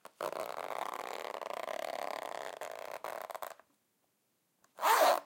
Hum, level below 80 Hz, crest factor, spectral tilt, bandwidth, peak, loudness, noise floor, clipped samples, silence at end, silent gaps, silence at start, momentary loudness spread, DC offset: none; -88 dBFS; 22 dB; -0.5 dB/octave; 17 kHz; -16 dBFS; -37 LUFS; -78 dBFS; under 0.1%; 0 s; none; 0.2 s; 14 LU; under 0.1%